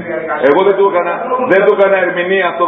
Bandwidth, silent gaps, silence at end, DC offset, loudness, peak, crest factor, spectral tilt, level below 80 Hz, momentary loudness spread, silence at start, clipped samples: 4 kHz; none; 0 s; under 0.1%; -12 LUFS; 0 dBFS; 12 dB; -7.5 dB/octave; -58 dBFS; 6 LU; 0 s; 0.1%